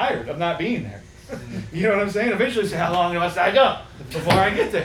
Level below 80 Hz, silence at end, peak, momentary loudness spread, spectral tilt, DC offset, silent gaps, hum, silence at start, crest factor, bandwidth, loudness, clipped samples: -48 dBFS; 0 s; -2 dBFS; 15 LU; -5.5 dB/octave; under 0.1%; none; none; 0 s; 18 dB; 18 kHz; -21 LUFS; under 0.1%